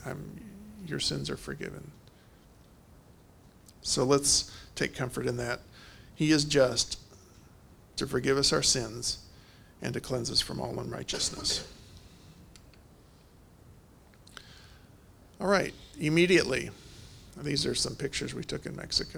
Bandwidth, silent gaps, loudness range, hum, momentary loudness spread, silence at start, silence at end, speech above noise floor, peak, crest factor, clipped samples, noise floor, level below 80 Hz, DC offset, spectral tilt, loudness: over 20 kHz; none; 9 LU; none; 23 LU; 0 s; 0 s; 27 dB; -10 dBFS; 24 dB; under 0.1%; -57 dBFS; -54 dBFS; under 0.1%; -3.5 dB/octave; -29 LUFS